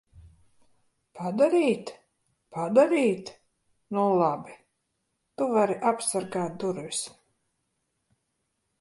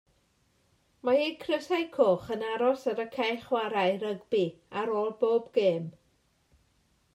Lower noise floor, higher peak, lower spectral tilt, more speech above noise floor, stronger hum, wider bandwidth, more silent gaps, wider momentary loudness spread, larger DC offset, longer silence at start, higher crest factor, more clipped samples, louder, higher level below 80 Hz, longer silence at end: first, -78 dBFS vs -70 dBFS; about the same, -8 dBFS vs -10 dBFS; about the same, -5 dB/octave vs -6 dB/octave; first, 53 dB vs 41 dB; neither; second, 11.5 kHz vs 14 kHz; neither; first, 15 LU vs 7 LU; neither; second, 0.15 s vs 1.05 s; about the same, 20 dB vs 20 dB; neither; first, -26 LUFS vs -29 LUFS; about the same, -68 dBFS vs -72 dBFS; first, 1.75 s vs 1.25 s